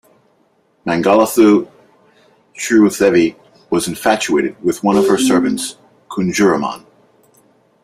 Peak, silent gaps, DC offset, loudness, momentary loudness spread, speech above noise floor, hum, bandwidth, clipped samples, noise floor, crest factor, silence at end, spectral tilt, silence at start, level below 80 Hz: 0 dBFS; none; under 0.1%; -14 LUFS; 14 LU; 44 dB; none; 16 kHz; under 0.1%; -58 dBFS; 16 dB; 1.05 s; -4.5 dB/octave; 0.85 s; -54 dBFS